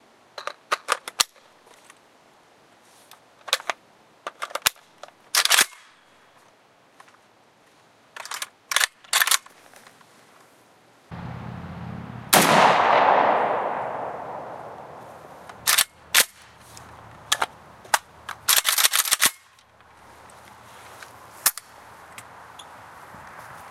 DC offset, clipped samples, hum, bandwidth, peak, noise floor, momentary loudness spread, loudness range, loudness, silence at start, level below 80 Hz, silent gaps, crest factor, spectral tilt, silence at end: under 0.1%; under 0.1%; none; 16.5 kHz; 0 dBFS; -57 dBFS; 26 LU; 11 LU; -21 LUFS; 0.35 s; -62 dBFS; none; 26 dB; -1 dB/octave; 0 s